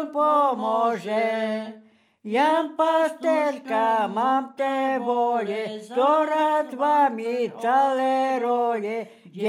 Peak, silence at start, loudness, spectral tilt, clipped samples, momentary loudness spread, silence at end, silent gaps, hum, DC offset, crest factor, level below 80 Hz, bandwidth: -10 dBFS; 0 s; -23 LUFS; -5 dB/octave; under 0.1%; 8 LU; 0 s; none; none; under 0.1%; 12 dB; under -90 dBFS; 15 kHz